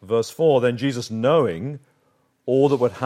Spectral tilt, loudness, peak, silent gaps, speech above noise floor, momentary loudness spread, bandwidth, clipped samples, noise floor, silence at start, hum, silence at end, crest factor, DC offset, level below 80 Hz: -6.5 dB/octave; -20 LUFS; -4 dBFS; none; 45 dB; 14 LU; 15 kHz; under 0.1%; -65 dBFS; 0 s; none; 0 s; 16 dB; under 0.1%; -66 dBFS